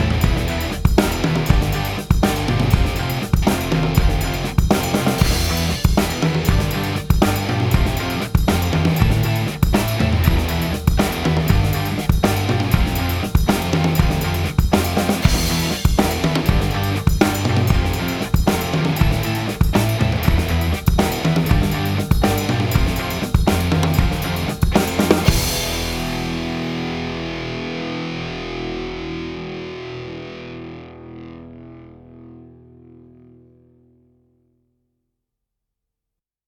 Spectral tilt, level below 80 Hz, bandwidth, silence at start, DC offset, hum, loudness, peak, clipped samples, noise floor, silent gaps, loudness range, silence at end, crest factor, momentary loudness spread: -5.5 dB/octave; -24 dBFS; 19 kHz; 0 s; under 0.1%; none; -19 LUFS; 0 dBFS; under 0.1%; -84 dBFS; none; 9 LU; 4 s; 18 dB; 9 LU